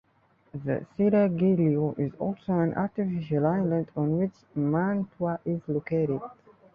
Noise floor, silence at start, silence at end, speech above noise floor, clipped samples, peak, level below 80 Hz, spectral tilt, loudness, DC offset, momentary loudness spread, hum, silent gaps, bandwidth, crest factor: -65 dBFS; 0.55 s; 0.4 s; 39 dB; under 0.1%; -12 dBFS; -62 dBFS; -11.5 dB/octave; -27 LUFS; under 0.1%; 9 LU; none; none; 5 kHz; 16 dB